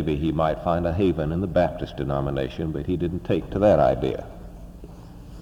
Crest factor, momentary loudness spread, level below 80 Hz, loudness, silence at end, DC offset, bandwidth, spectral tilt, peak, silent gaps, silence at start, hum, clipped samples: 18 dB; 23 LU; -40 dBFS; -24 LUFS; 0 s; under 0.1%; 15.5 kHz; -8.5 dB/octave; -6 dBFS; none; 0 s; none; under 0.1%